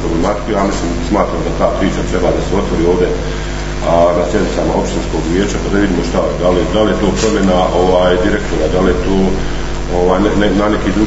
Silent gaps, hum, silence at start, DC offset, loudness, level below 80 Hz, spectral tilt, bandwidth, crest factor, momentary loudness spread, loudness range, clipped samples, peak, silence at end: none; none; 0 s; under 0.1%; -14 LUFS; -22 dBFS; -6 dB/octave; 8 kHz; 12 dB; 6 LU; 2 LU; under 0.1%; 0 dBFS; 0 s